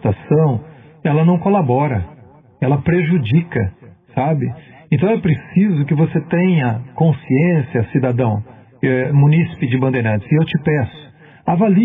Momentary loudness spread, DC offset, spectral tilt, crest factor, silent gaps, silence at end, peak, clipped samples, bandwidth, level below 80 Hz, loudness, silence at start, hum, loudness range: 10 LU; under 0.1%; -11.5 dB/octave; 12 dB; none; 0 s; -4 dBFS; under 0.1%; 3.8 kHz; -52 dBFS; -17 LUFS; 0.05 s; none; 2 LU